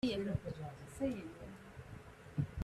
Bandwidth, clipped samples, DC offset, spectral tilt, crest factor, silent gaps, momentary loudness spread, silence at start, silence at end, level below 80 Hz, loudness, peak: 13.5 kHz; under 0.1%; under 0.1%; -7 dB/octave; 18 dB; none; 14 LU; 0.05 s; 0 s; -60 dBFS; -43 LUFS; -24 dBFS